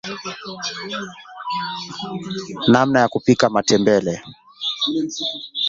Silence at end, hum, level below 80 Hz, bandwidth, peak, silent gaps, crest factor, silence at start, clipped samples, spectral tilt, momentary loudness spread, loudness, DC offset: 0 s; none; -56 dBFS; 7.8 kHz; -2 dBFS; none; 18 dB; 0.05 s; under 0.1%; -4.5 dB/octave; 14 LU; -20 LUFS; under 0.1%